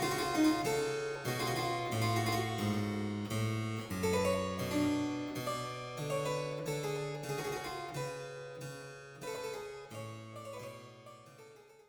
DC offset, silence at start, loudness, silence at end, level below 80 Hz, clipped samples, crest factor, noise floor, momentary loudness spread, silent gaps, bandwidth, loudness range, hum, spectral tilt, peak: under 0.1%; 0 s; -36 LUFS; 0.15 s; -64 dBFS; under 0.1%; 18 dB; -57 dBFS; 15 LU; none; over 20 kHz; 10 LU; none; -5 dB/octave; -20 dBFS